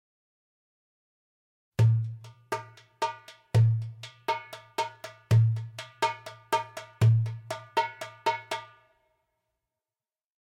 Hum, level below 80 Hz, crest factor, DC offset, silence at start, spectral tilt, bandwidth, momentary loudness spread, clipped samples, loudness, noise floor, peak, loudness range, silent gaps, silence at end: none; -60 dBFS; 18 dB; under 0.1%; 1.8 s; -6 dB/octave; 12.5 kHz; 15 LU; under 0.1%; -29 LUFS; under -90 dBFS; -12 dBFS; 4 LU; none; 1.9 s